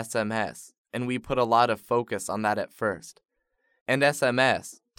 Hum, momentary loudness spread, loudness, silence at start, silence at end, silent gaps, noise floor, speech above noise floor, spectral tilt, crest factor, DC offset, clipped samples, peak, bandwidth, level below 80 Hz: none; 12 LU; -26 LUFS; 0 s; 0.25 s; 0.78-0.85 s, 3.81-3.86 s; -74 dBFS; 47 dB; -4.5 dB/octave; 20 dB; under 0.1%; under 0.1%; -8 dBFS; 17.5 kHz; -60 dBFS